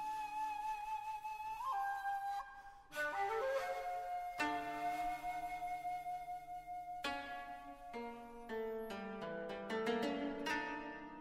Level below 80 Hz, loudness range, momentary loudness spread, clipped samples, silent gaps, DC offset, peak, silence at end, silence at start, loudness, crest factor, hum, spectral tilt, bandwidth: -66 dBFS; 5 LU; 10 LU; under 0.1%; none; under 0.1%; -24 dBFS; 0 s; 0 s; -43 LUFS; 18 dB; none; -4 dB/octave; 16 kHz